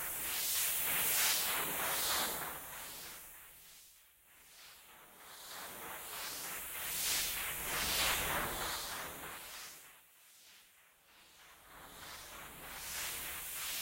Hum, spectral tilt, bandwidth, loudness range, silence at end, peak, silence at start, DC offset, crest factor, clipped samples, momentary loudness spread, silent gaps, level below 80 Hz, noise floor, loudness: none; 0 dB/octave; 16 kHz; 16 LU; 0 s; -20 dBFS; 0 s; under 0.1%; 20 dB; under 0.1%; 23 LU; none; -62 dBFS; -66 dBFS; -36 LUFS